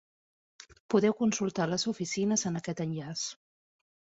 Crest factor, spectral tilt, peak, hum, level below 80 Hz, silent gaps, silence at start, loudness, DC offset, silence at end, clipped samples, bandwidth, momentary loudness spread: 18 dB; -4.5 dB/octave; -14 dBFS; none; -70 dBFS; 0.80-0.89 s; 0.6 s; -31 LUFS; under 0.1%; 0.85 s; under 0.1%; 8 kHz; 8 LU